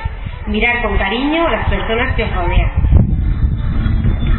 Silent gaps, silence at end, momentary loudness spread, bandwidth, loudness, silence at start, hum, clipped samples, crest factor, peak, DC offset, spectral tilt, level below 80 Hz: none; 0 s; 5 LU; 4.2 kHz; -16 LUFS; 0 s; none; under 0.1%; 14 dB; 0 dBFS; under 0.1%; -12 dB/octave; -18 dBFS